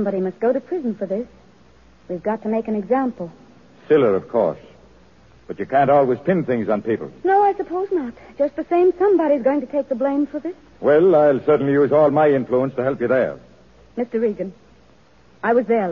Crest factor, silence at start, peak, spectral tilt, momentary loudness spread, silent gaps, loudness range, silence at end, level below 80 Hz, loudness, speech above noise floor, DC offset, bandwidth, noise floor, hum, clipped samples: 14 dB; 0 s; -6 dBFS; -9 dB/octave; 14 LU; none; 6 LU; 0 s; -58 dBFS; -19 LUFS; 34 dB; 0.2%; 6.6 kHz; -53 dBFS; none; under 0.1%